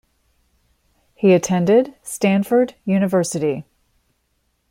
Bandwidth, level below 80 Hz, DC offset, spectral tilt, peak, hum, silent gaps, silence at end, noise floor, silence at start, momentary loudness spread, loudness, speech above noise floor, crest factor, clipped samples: 16 kHz; -60 dBFS; under 0.1%; -6 dB/octave; -4 dBFS; none; none; 1.1 s; -68 dBFS; 1.2 s; 8 LU; -18 LUFS; 51 dB; 16 dB; under 0.1%